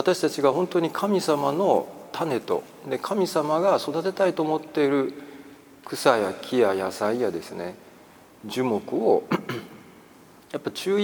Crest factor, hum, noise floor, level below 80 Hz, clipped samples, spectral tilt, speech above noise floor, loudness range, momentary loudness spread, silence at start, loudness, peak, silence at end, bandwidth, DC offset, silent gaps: 22 dB; none; -51 dBFS; -70 dBFS; under 0.1%; -5 dB/octave; 27 dB; 4 LU; 14 LU; 0 s; -25 LUFS; -4 dBFS; 0 s; over 20 kHz; under 0.1%; none